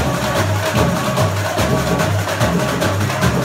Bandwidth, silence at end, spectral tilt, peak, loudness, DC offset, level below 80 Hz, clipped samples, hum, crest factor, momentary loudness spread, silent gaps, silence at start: 16.5 kHz; 0 s; -5 dB/octave; -4 dBFS; -17 LUFS; under 0.1%; -32 dBFS; under 0.1%; none; 14 dB; 1 LU; none; 0 s